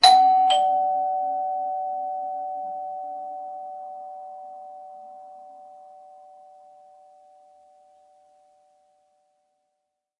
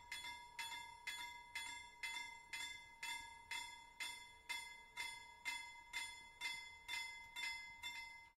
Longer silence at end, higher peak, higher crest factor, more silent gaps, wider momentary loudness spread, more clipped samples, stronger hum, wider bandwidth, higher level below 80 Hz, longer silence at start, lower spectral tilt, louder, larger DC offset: first, 4.2 s vs 0.05 s; first, -2 dBFS vs -32 dBFS; first, 24 dB vs 18 dB; neither; first, 26 LU vs 4 LU; neither; neither; second, 11 kHz vs 16 kHz; about the same, -76 dBFS vs -76 dBFS; about the same, 0 s vs 0 s; about the same, 0.5 dB/octave vs 1 dB/octave; first, -24 LUFS vs -49 LUFS; neither